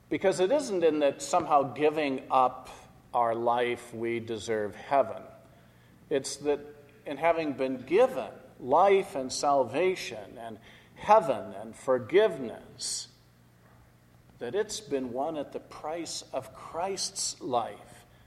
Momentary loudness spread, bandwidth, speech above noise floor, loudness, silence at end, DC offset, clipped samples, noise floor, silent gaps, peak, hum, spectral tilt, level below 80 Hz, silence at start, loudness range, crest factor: 17 LU; 13.5 kHz; 31 dB; -29 LUFS; 0.25 s; under 0.1%; under 0.1%; -59 dBFS; none; -8 dBFS; none; -4 dB/octave; -66 dBFS; 0.1 s; 8 LU; 22 dB